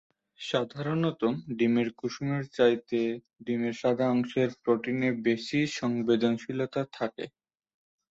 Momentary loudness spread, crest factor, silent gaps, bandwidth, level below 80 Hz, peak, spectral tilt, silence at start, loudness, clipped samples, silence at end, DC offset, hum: 8 LU; 20 dB; none; 7.8 kHz; -68 dBFS; -10 dBFS; -6.5 dB/octave; 0.4 s; -29 LUFS; under 0.1%; 0.85 s; under 0.1%; none